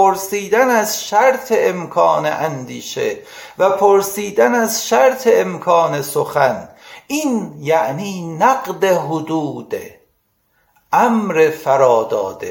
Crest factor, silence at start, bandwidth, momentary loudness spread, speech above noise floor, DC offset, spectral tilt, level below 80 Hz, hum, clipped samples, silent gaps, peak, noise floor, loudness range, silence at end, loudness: 16 dB; 0 s; 17 kHz; 11 LU; 48 dB; under 0.1%; -4 dB/octave; -62 dBFS; none; under 0.1%; none; 0 dBFS; -63 dBFS; 4 LU; 0 s; -16 LUFS